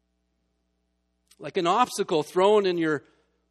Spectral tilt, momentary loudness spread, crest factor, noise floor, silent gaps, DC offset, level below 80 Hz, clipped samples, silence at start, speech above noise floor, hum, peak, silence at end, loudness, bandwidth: -4.5 dB/octave; 11 LU; 20 dB; -74 dBFS; none; under 0.1%; -72 dBFS; under 0.1%; 1.4 s; 51 dB; none; -8 dBFS; 0.5 s; -24 LUFS; 13.5 kHz